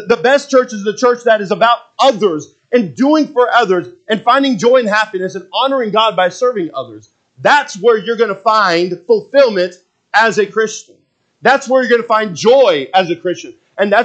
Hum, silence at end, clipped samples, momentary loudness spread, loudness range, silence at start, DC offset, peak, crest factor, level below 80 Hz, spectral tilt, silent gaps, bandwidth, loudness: none; 0 s; under 0.1%; 9 LU; 1 LU; 0 s; under 0.1%; 0 dBFS; 12 dB; -66 dBFS; -4 dB/octave; none; 8.6 kHz; -13 LUFS